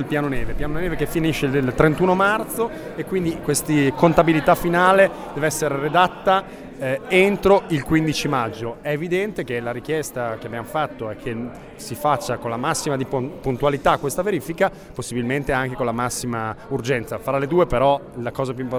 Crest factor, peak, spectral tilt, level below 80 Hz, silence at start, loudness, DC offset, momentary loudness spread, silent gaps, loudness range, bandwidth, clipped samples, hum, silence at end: 20 dB; 0 dBFS; -5.5 dB/octave; -40 dBFS; 0 s; -21 LUFS; under 0.1%; 11 LU; none; 7 LU; over 20 kHz; under 0.1%; none; 0 s